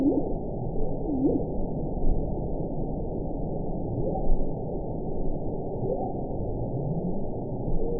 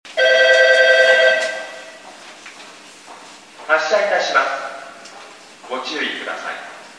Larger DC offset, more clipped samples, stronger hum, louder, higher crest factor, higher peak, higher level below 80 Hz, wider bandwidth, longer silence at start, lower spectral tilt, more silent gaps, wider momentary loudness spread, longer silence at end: first, 1% vs under 0.1%; neither; neither; second, -31 LUFS vs -15 LUFS; about the same, 16 dB vs 18 dB; second, -10 dBFS vs 0 dBFS; first, -32 dBFS vs -82 dBFS; second, 1 kHz vs 11 kHz; about the same, 0 s vs 0.05 s; first, -18.5 dB/octave vs 0 dB/octave; neither; second, 6 LU vs 26 LU; about the same, 0 s vs 0.1 s